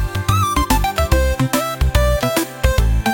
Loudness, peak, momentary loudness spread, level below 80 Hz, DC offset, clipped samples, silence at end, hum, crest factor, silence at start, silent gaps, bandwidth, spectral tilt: -17 LUFS; -2 dBFS; 2 LU; -20 dBFS; under 0.1%; under 0.1%; 0 s; none; 14 dB; 0 s; none; 17 kHz; -5 dB/octave